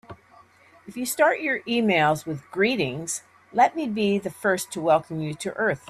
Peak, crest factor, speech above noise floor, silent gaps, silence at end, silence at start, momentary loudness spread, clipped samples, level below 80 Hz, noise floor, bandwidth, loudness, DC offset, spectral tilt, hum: -8 dBFS; 18 dB; 31 dB; none; 0.1 s; 0.1 s; 10 LU; under 0.1%; -64 dBFS; -54 dBFS; 15.5 kHz; -24 LUFS; under 0.1%; -4.5 dB/octave; none